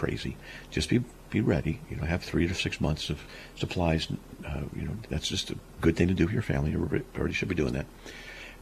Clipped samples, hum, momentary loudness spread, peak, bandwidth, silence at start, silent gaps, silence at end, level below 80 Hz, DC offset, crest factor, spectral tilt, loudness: under 0.1%; none; 11 LU; -10 dBFS; 14.5 kHz; 0 s; none; 0 s; -42 dBFS; under 0.1%; 20 dB; -6 dB/octave; -30 LUFS